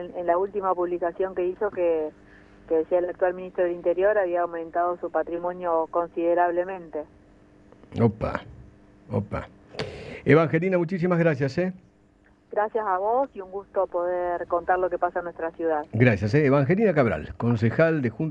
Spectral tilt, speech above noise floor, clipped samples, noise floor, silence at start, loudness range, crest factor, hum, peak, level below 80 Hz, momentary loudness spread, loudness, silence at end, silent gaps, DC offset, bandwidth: -9 dB/octave; 34 dB; under 0.1%; -58 dBFS; 0 s; 5 LU; 22 dB; none; -2 dBFS; -52 dBFS; 11 LU; -25 LUFS; 0 s; none; under 0.1%; 8 kHz